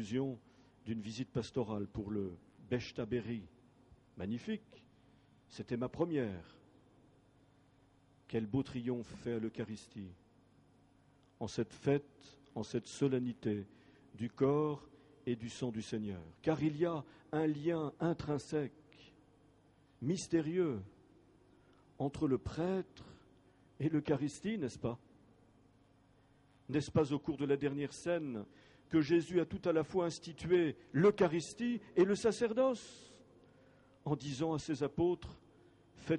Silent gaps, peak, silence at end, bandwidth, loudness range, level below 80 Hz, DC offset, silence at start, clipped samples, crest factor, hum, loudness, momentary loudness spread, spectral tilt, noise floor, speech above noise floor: none; -20 dBFS; 0 s; 11 kHz; 9 LU; -66 dBFS; under 0.1%; 0 s; under 0.1%; 20 dB; none; -37 LUFS; 14 LU; -6.5 dB/octave; -68 dBFS; 32 dB